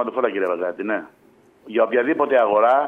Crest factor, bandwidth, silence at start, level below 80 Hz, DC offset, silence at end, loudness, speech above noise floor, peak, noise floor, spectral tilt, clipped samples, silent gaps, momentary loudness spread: 16 dB; 4 kHz; 0 s; -72 dBFS; under 0.1%; 0 s; -20 LUFS; 30 dB; -4 dBFS; -49 dBFS; -7 dB/octave; under 0.1%; none; 10 LU